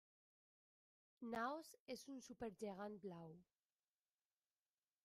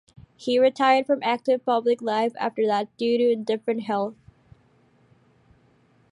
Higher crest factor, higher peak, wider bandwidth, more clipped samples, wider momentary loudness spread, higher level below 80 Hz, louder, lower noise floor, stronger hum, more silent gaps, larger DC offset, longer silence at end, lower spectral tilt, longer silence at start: about the same, 22 dB vs 18 dB; second, -34 dBFS vs -8 dBFS; first, 15 kHz vs 10.5 kHz; neither; first, 12 LU vs 7 LU; second, -84 dBFS vs -68 dBFS; second, -52 LUFS vs -23 LUFS; first, under -90 dBFS vs -60 dBFS; neither; first, 1.80-1.86 s vs none; neither; second, 1.6 s vs 2 s; about the same, -5 dB/octave vs -5.5 dB/octave; first, 1.2 s vs 0.4 s